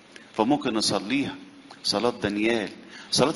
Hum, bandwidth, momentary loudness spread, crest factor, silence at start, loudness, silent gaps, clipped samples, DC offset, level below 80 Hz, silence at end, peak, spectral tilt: none; 11.5 kHz; 12 LU; 22 dB; 0.2 s; -26 LUFS; none; under 0.1%; under 0.1%; -60 dBFS; 0 s; -4 dBFS; -3.5 dB/octave